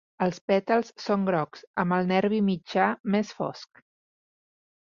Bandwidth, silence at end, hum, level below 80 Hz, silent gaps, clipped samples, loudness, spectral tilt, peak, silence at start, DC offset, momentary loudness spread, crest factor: 7.2 kHz; 1.2 s; none; -68 dBFS; 0.41-0.48 s, 1.67-1.74 s, 3.00-3.04 s; under 0.1%; -26 LUFS; -7 dB/octave; -8 dBFS; 0.2 s; under 0.1%; 9 LU; 20 dB